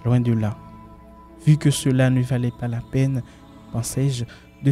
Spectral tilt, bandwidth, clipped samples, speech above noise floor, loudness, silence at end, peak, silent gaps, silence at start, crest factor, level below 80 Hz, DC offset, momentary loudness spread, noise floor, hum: -6.5 dB/octave; 14 kHz; under 0.1%; 24 dB; -22 LUFS; 0 s; -6 dBFS; none; 0 s; 16 dB; -48 dBFS; under 0.1%; 12 LU; -44 dBFS; none